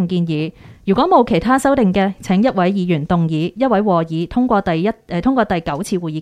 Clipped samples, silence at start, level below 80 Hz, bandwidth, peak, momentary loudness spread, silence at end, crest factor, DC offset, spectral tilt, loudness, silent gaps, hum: under 0.1%; 0 s; -42 dBFS; 13.5 kHz; -2 dBFS; 7 LU; 0 s; 14 dB; under 0.1%; -7 dB/octave; -16 LUFS; none; none